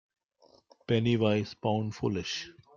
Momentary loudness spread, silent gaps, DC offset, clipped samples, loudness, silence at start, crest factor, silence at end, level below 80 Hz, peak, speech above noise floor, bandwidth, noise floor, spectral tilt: 10 LU; none; under 0.1%; under 0.1%; -30 LUFS; 0.9 s; 20 dB; 0.25 s; -64 dBFS; -12 dBFS; 34 dB; 7.2 kHz; -64 dBFS; -6.5 dB/octave